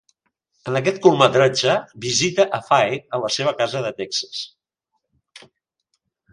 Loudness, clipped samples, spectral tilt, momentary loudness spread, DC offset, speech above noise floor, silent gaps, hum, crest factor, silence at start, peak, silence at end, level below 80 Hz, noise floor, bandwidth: -19 LUFS; under 0.1%; -4 dB/octave; 11 LU; under 0.1%; 57 dB; none; none; 22 dB; 0.65 s; 0 dBFS; 0.95 s; -62 dBFS; -76 dBFS; 11 kHz